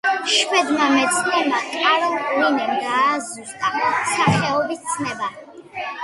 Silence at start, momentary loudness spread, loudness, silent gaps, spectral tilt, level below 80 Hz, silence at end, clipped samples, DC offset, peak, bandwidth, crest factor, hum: 0.05 s; 10 LU; -19 LUFS; none; -3 dB/octave; -58 dBFS; 0 s; under 0.1%; under 0.1%; -2 dBFS; 11.5 kHz; 18 dB; none